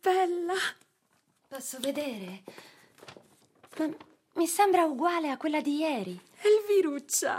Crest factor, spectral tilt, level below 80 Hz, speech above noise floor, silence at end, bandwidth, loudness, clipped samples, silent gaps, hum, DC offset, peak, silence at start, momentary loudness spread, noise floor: 18 dB; -3 dB/octave; -88 dBFS; 43 dB; 0 s; 16 kHz; -29 LUFS; under 0.1%; none; none; under 0.1%; -12 dBFS; 0.05 s; 18 LU; -71 dBFS